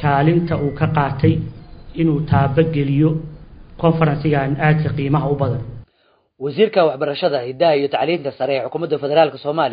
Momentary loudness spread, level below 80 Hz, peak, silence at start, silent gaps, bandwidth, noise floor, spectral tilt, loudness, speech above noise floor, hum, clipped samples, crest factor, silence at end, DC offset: 7 LU; -42 dBFS; 0 dBFS; 0 s; none; 5.2 kHz; -60 dBFS; -12.5 dB/octave; -18 LUFS; 43 dB; none; under 0.1%; 18 dB; 0 s; under 0.1%